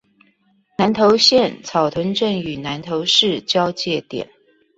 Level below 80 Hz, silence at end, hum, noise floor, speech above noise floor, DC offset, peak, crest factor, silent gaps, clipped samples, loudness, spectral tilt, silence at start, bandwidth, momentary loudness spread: -56 dBFS; 0.55 s; none; -60 dBFS; 42 dB; under 0.1%; -2 dBFS; 18 dB; none; under 0.1%; -17 LUFS; -4 dB/octave; 0.8 s; 8 kHz; 15 LU